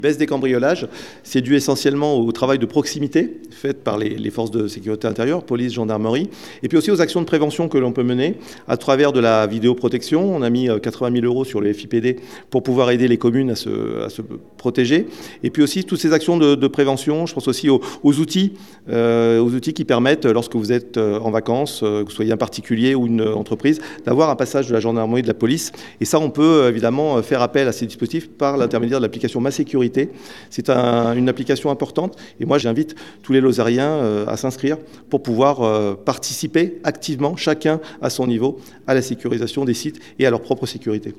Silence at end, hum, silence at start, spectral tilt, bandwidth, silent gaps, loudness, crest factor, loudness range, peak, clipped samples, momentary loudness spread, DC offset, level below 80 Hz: 0.05 s; none; 0 s; -6 dB/octave; 14.5 kHz; none; -19 LUFS; 18 dB; 3 LU; 0 dBFS; under 0.1%; 8 LU; 0.3%; -62 dBFS